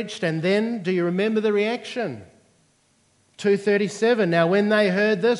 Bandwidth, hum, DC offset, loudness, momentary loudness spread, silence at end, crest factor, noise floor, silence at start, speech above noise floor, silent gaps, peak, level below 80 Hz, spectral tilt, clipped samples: 11.5 kHz; none; under 0.1%; -22 LUFS; 9 LU; 0 s; 18 dB; -63 dBFS; 0 s; 42 dB; none; -4 dBFS; -74 dBFS; -6 dB/octave; under 0.1%